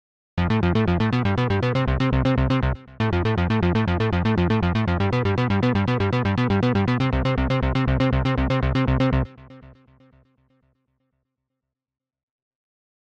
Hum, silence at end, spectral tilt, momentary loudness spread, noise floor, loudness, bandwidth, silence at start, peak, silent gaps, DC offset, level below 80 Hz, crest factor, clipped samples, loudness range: none; 3.45 s; -8 dB/octave; 2 LU; -83 dBFS; -22 LUFS; 7.2 kHz; 0.35 s; -12 dBFS; none; under 0.1%; -32 dBFS; 10 dB; under 0.1%; 5 LU